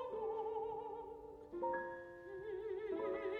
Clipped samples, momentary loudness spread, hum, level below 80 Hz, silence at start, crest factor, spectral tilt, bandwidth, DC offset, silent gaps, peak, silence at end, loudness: under 0.1%; 10 LU; none; -72 dBFS; 0 s; 14 dB; -7 dB/octave; 5.4 kHz; under 0.1%; none; -30 dBFS; 0 s; -45 LUFS